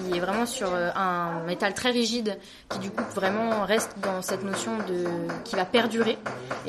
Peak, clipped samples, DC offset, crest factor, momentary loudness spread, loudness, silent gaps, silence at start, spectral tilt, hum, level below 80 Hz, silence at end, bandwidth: -8 dBFS; under 0.1%; under 0.1%; 20 dB; 8 LU; -27 LUFS; none; 0 s; -4 dB/octave; none; -60 dBFS; 0 s; 13 kHz